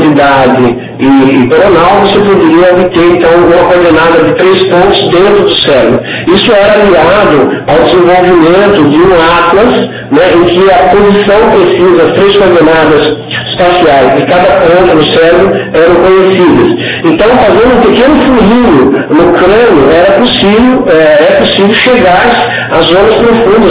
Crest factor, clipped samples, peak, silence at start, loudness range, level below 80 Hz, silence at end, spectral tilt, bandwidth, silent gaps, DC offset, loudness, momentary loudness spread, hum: 4 dB; 10%; 0 dBFS; 0 s; 1 LU; -30 dBFS; 0 s; -9.5 dB/octave; 4 kHz; none; under 0.1%; -4 LUFS; 3 LU; none